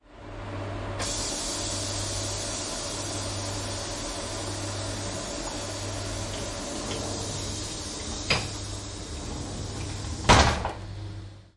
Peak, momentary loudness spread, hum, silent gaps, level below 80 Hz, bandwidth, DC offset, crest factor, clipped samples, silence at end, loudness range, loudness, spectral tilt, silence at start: -2 dBFS; 9 LU; none; none; -40 dBFS; 11.5 kHz; under 0.1%; 28 dB; under 0.1%; 0.1 s; 6 LU; -30 LUFS; -3 dB/octave; 0.05 s